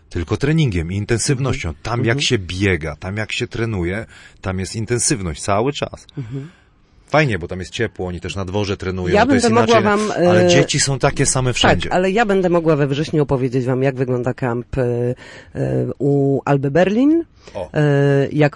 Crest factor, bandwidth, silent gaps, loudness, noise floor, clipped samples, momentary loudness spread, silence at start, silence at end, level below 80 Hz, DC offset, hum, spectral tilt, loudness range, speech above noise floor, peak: 14 dB; 11.5 kHz; none; -18 LUFS; -51 dBFS; under 0.1%; 12 LU; 0.1 s; 0 s; -38 dBFS; under 0.1%; none; -5 dB/octave; 7 LU; 34 dB; -4 dBFS